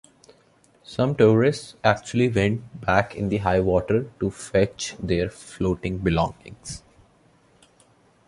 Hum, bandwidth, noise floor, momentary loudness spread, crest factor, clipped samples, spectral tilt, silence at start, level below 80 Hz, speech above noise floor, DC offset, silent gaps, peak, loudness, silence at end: none; 11.5 kHz; -59 dBFS; 12 LU; 22 dB; under 0.1%; -6 dB/octave; 0.9 s; -44 dBFS; 36 dB; under 0.1%; none; -2 dBFS; -23 LUFS; 1.5 s